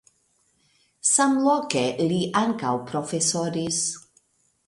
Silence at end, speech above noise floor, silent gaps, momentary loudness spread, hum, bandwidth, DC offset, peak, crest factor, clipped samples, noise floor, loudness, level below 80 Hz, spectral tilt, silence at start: 0.65 s; 44 dB; none; 9 LU; none; 11.5 kHz; under 0.1%; -2 dBFS; 22 dB; under 0.1%; -67 dBFS; -23 LUFS; -66 dBFS; -3.5 dB/octave; 1.05 s